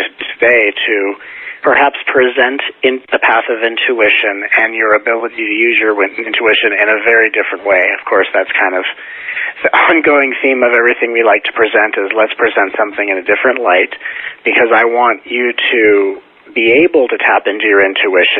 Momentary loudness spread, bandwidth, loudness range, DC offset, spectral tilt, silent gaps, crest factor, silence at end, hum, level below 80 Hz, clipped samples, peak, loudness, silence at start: 7 LU; 4.3 kHz; 1 LU; under 0.1%; -5.5 dB/octave; none; 12 dB; 0 s; none; -56 dBFS; under 0.1%; 0 dBFS; -11 LUFS; 0 s